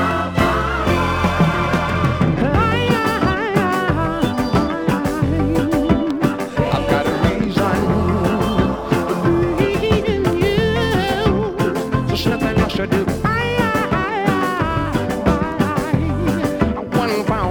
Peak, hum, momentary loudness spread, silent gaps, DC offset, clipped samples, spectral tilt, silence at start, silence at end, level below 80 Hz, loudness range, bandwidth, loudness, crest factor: 0 dBFS; none; 3 LU; none; under 0.1%; under 0.1%; -6.5 dB/octave; 0 s; 0 s; -32 dBFS; 1 LU; over 20 kHz; -18 LUFS; 16 dB